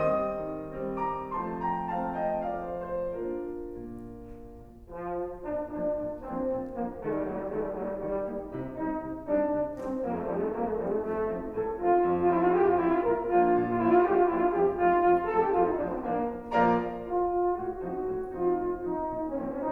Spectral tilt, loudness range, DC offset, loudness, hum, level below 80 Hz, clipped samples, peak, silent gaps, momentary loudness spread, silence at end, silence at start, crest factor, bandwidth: -9.5 dB/octave; 10 LU; under 0.1%; -29 LUFS; none; -52 dBFS; under 0.1%; -12 dBFS; none; 11 LU; 0 s; 0 s; 18 dB; 4.2 kHz